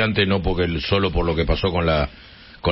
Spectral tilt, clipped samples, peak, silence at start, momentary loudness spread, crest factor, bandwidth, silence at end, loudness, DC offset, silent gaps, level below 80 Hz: -10 dB/octave; under 0.1%; -4 dBFS; 0 s; 3 LU; 16 dB; 5.8 kHz; 0 s; -21 LUFS; under 0.1%; none; -30 dBFS